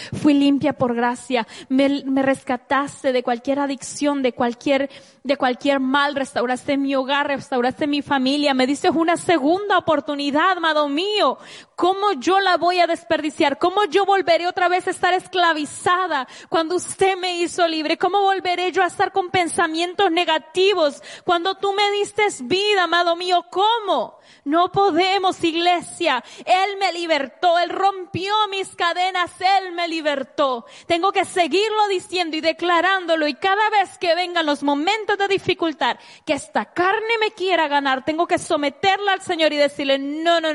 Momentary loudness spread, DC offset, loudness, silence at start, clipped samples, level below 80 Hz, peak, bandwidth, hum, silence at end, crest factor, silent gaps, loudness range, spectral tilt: 5 LU; under 0.1%; -20 LUFS; 0 s; under 0.1%; -64 dBFS; -6 dBFS; 11.5 kHz; none; 0 s; 14 dB; none; 2 LU; -3.5 dB/octave